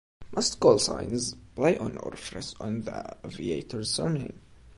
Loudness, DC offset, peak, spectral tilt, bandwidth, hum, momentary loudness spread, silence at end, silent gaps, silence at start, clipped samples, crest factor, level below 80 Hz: -28 LUFS; under 0.1%; -6 dBFS; -4.5 dB/octave; 11.5 kHz; none; 16 LU; 0.1 s; none; 0.2 s; under 0.1%; 22 dB; -54 dBFS